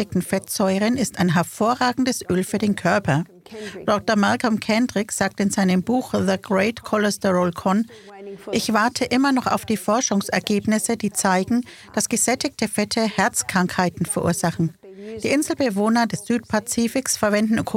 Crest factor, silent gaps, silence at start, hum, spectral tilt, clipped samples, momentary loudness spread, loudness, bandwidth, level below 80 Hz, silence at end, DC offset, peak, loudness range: 18 dB; none; 0 s; none; -4.5 dB/octave; under 0.1%; 5 LU; -21 LUFS; 17 kHz; -54 dBFS; 0 s; under 0.1%; -4 dBFS; 1 LU